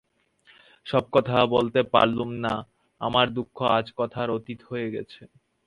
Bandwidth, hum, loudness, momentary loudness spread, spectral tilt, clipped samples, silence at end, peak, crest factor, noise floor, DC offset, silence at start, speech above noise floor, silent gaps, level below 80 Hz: 11 kHz; none; -25 LUFS; 12 LU; -7 dB/octave; under 0.1%; 0.4 s; -2 dBFS; 24 dB; -60 dBFS; under 0.1%; 0.85 s; 36 dB; none; -58 dBFS